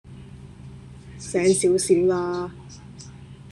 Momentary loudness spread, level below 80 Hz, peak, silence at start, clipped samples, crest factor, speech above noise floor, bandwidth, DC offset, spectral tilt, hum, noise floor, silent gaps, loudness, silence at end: 24 LU; -50 dBFS; -6 dBFS; 0.05 s; under 0.1%; 18 dB; 22 dB; 12.5 kHz; under 0.1%; -5 dB/octave; none; -42 dBFS; none; -21 LUFS; 0 s